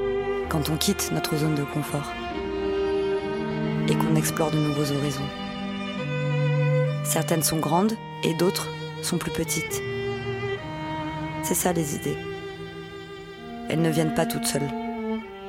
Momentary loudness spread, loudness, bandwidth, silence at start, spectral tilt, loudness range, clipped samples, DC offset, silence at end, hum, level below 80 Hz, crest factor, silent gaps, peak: 9 LU; -26 LUFS; 16.5 kHz; 0 s; -5 dB/octave; 4 LU; under 0.1%; under 0.1%; 0 s; none; -48 dBFS; 22 dB; none; -4 dBFS